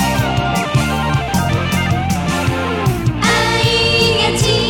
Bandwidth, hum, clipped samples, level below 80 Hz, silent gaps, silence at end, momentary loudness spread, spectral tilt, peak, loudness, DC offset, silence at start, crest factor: 18 kHz; none; under 0.1%; -30 dBFS; none; 0 s; 5 LU; -4.5 dB/octave; 0 dBFS; -15 LUFS; under 0.1%; 0 s; 14 dB